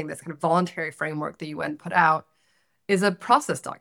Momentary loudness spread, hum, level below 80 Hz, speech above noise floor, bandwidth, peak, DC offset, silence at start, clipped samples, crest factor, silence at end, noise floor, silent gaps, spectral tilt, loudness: 11 LU; none; -72 dBFS; 44 dB; 17 kHz; -4 dBFS; under 0.1%; 0 s; under 0.1%; 22 dB; 0.05 s; -69 dBFS; none; -5 dB/octave; -24 LUFS